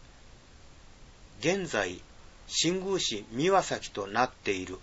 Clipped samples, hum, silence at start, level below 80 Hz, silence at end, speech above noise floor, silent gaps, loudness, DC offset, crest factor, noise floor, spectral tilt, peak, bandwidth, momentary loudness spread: under 0.1%; none; 0 s; -54 dBFS; 0 s; 23 dB; none; -30 LUFS; under 0.1%; 22 dB; -53 dBFS; -3 dB/octave; -10 dBFS; 8 kHz; 8 LU